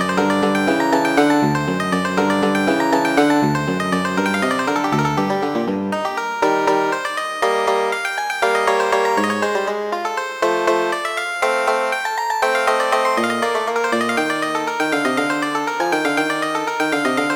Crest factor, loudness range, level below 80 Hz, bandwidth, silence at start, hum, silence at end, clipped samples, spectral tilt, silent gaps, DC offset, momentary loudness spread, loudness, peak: 16 dB; 2 LU; -56 dBFS; 19.5 kHz; 0 s; none; 0 s; under 0.1%; -4.5 dB/octave; none; under 0.1%; 5 LU; -18 LUFS; -2 dBFS